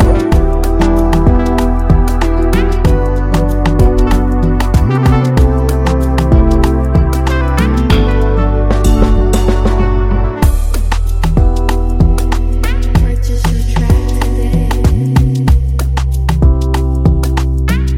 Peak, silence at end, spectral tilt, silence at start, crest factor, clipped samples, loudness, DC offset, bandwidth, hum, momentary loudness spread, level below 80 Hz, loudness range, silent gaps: 0 dBFS; 0 s; -7 dB/octave; 0 s; 10 dB; under 0.1%; -12 LUFS; under 0.1%; 15.5 kHz; none; 4 LU; -12 dBFS; 2 LU; none